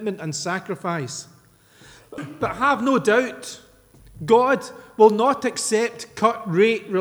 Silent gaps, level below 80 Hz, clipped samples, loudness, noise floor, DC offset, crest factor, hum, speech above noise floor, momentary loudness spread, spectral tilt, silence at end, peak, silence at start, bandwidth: none; -58 dBFS; under 0.1%; -21 LUFS; -52 dBFS; under 0.1%; 20 dB; none; 32 dB; 19 LU; -4.5 dB/octave; 0 s; -2 dBFS; 0 s; over 20 kHz